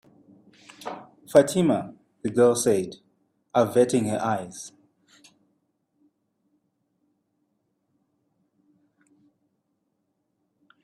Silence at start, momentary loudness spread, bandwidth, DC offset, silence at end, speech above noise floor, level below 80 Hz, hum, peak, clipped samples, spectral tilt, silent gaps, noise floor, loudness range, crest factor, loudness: 0.8 s; 21 LU; 15 kHz; under 0.1%; 6.15 s; 54 dB; -68 dBFS; none; -2 dBFS; under 0.1%; -5.5 dB/octave; none; -76 dBFS; 11 LU; 26 dB; -23 LUFS